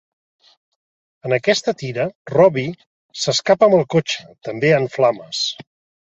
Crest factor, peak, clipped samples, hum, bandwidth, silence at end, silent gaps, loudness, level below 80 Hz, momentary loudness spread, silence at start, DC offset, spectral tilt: 18 dB; -2 dBFS; under 0.1%; none; 8.2 kHz; 0.5 s; 2.15-2.25 s, 2.86-3.09 s; -18 LUFS; -60 dBFS; 13 LU; 1.25 s; under 0.1%; -4.5 dB/octave